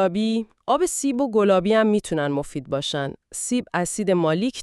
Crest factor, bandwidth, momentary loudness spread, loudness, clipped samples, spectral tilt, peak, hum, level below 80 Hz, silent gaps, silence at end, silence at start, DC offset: 16 dB; 13.5 kHz; 9 LU; -22 LUFS; under 0.1%; -4.5 dB/octave; -6 dBFS; none; -54 dBFS; none; 0 s; 0 s; under 0.1%